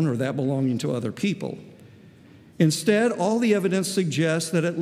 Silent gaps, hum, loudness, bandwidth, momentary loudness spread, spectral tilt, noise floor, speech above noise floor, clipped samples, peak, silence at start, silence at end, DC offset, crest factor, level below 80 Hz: none; none; -23 LUFS; 15.5 kHz; 6 LU; -5.5 dB/octave; -50 dBFS; 27 dB; under 0.1%; -6 dBFS; 0 s; 0 s; under 0.1%; 18 dB; -72 dBFS